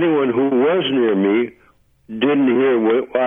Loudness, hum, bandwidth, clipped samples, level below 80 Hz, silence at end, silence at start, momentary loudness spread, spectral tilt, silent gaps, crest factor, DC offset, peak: -17 LUFS; none; 3.7 kHz; under 0.1%; -60 dBFS; 0 s; 0 s; 6 LU; -9 dB/octave; none; 12 dB; under 0.1%; -6 dBFS